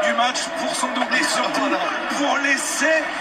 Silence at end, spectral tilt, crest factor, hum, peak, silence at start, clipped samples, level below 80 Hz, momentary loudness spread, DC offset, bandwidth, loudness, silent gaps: 0 s; -1 dB/octave; 14 dB; none; -6 dBFS; 0 s; under 0.1%; -62 dBFS; 4 LU; under 0.1%; 15 kHz; -20 LUFS; none